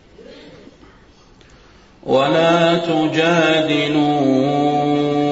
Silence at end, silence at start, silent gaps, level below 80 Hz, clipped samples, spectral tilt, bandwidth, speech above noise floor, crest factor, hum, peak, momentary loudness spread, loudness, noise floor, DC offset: 0 s; 0.2 s; none; -52 dBFS; under 0.1%; -6 dB/octave; 8 kHz; 32 dB; 14 dB; none; -4 dBFS; 3 LU; -16 LUFS; -47 dBFS; under 0.1%